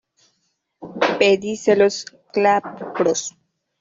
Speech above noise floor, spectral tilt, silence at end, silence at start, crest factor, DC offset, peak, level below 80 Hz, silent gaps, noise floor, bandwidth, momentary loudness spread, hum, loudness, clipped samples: 52 dB; -3.5 dB/octave; 0.5 s; 0.8 s; 18 dB; under 0.1%; -2 dBFS; -64 dBFS; none; -71 dBFS; 7.8 kHz; 14 LU; none; -19 LUFS; under 0.1%